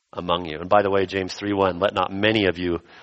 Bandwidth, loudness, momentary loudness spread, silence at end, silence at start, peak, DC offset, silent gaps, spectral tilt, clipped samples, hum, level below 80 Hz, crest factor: 8.4 kHz; -22 LUFS; 7 LU; 0 s; 0.15 s; -4 dBFS; under 0.1%; none; -6 dB/octave; under 0.1%; none; -52 dBFS; 20 dB